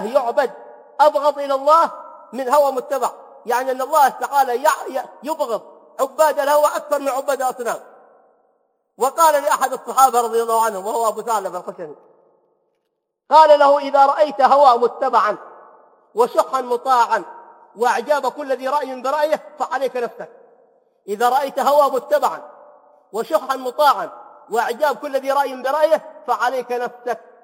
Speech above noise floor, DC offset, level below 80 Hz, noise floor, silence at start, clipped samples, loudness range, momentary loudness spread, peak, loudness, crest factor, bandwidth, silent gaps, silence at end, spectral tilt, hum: 57 dB; under 0.1%; -78 dBFS; -75 dBFS; 0 s; under 0.1%; 6 LU; 14 LU; 0 dBFS; -18 LUFS; 18 dB; 16.5 kHz; none; 0.25 s; -2 dB/octave; none